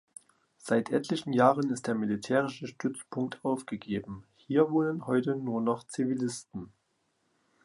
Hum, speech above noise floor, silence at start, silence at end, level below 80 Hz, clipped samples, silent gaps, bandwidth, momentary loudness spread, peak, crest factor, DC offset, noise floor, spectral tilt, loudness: none; 46 dB; 0.65 s; 1 s; -68 dBFS; under 0.1%; none; 11.5 kHz; 14 LU; -8 dBFS; 22 dB; under 0.1%; -75 dBFS; -6 dB/octave; -30 LUFS